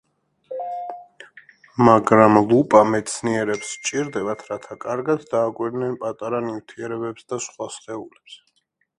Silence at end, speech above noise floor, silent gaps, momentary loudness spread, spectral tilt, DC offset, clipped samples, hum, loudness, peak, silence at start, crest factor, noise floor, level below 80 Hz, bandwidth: 0.65 s; 48 dB; none; 19 LU; -5.5 dB/octave; under 0.1%; under 0.1%; none; -20 LUFS; 0 dBFS; 0.5 s; 22 dB; -68 dBFS; -58 dBFS; 11.5 kHz